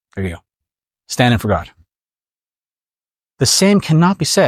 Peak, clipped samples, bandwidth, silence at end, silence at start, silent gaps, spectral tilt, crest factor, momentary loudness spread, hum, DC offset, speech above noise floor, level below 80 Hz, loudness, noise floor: -2 dBFS; under 0.1%; 16 kHz; 0 s; 0.15 s; none; -4.5 dB/octave; 16 dB; 14 LU; none; under 0.1%; over 76 dB; -46 dBFS; -14 LUFS; under -90 dBFS